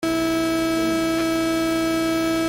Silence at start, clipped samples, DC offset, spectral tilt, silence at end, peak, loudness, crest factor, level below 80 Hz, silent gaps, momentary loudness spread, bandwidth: 0 s; under 0.1%; under 0.1%; -4 dB/octave; 0 s; -12 dBFS; -21 LUFS; 8 dB; -46 dBFS; none; 0 LU; 16.5 kHz